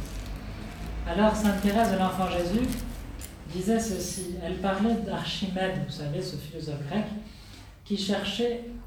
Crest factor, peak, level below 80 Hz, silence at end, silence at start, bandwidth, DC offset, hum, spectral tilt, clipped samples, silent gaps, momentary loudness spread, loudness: 18 dB; -10 dBFS; -42 dBFS; 0 s; 0 s; 20 kHz; under 0.1%; none; -5 dB/octave; under 0.1%; none; 15 LU; -29 LUFS